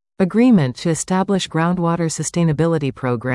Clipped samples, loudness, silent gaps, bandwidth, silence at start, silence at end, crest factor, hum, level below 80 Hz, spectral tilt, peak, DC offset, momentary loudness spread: under 0.1%; -18 LUFS; none; 12 kHz; 0.2 s; 0 s; 12 dB; none; -50 dBFS; -6 dB/octave; -4 dBFS; under 0.1%; 7 LU